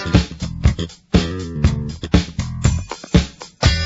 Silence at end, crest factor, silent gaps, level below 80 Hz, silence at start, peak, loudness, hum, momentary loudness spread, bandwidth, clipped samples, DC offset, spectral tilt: 0 s; 18 dB; none; -24 dBFS; 0 s; 0 dBFS; -20 LUFS; none; 8 LU; 8 kHz; under 0.1%; under 0.1%; -5.5 dB/octave